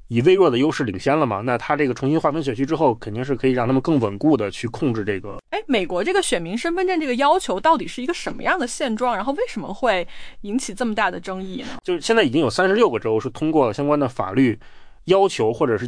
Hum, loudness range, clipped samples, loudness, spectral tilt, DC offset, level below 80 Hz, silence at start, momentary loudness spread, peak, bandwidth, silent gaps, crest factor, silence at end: none; 4 LU; under 0.1%; -21 LUFS; -5.5 dB/octave; under 0.1%; -46 dBFS; 0.1 s; 9 LU; -6 dBFS; 10.5 kHz; none; 16 dB; 0 s